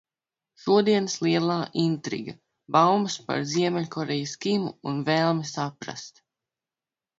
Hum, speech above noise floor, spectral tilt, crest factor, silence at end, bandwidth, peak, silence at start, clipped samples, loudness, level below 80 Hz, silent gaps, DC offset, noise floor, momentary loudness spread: none; over 65 dB; -5 dB/octave; 20 dB; 1.1 s; 7.8 kHz; -6 dBFS; 0.65 s; under 0.1%; -25 LUFS; -70 dBFS; none; under 0.1%; under -90 dBFS; 14 LU